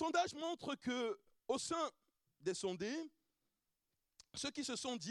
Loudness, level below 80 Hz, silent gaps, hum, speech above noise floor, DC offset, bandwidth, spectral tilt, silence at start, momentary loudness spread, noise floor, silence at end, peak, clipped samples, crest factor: -43 LUFS; -80 dBFS; none; none; 47 dB; under 0.1%; 13 kHz; -3 dB/octave; 0 s; 8 LU; -89 dBFS; 0 s; -24 dBFS; under 0.1%; 20 dB